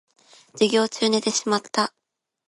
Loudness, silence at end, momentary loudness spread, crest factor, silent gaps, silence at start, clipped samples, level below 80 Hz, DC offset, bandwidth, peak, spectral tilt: -22 LUFS; 0.6 s; 5 LU; 20 dB; none; 0.55 s; under 0.1%; -74 dBFS; under 0.1%; 11.5 kHz; -4 dBFS; -3 dB/octave